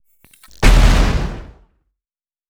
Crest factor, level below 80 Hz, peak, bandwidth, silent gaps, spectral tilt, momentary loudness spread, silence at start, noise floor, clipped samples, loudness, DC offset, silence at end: 16 dB; -16 dBFS; 0 dBFS; 13.5 kHz; none; -5 dB/octave; 15 LU; 0.6 s; under -90 dBFS; under 0.1%; -16 LUFS; under 0.1%; 1.05 s